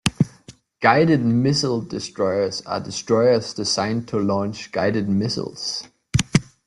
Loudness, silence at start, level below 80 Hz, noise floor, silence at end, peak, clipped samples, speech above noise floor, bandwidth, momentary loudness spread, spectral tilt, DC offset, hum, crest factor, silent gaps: -21 LUFS; 0.05 s; -48 dBFS; -48 dBFS; 0.25 s; 0 dBFS; under 0.1%; 27 dB; 12 kHz; 10 LU; -5 dB/octave; under 0.1%; none; 22 dB; none